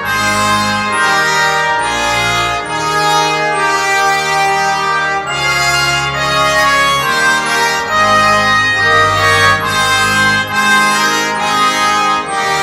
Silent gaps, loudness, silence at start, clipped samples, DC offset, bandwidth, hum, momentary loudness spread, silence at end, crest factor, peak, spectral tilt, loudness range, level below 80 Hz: none; -11 LUFS; 0 s; under 0.1%; under 0.1%; 16 kHz; none; 4 LU; 0 s; 12 dB; 0 dBFS; -2 dB/octave; 3 LU; -40 dBFS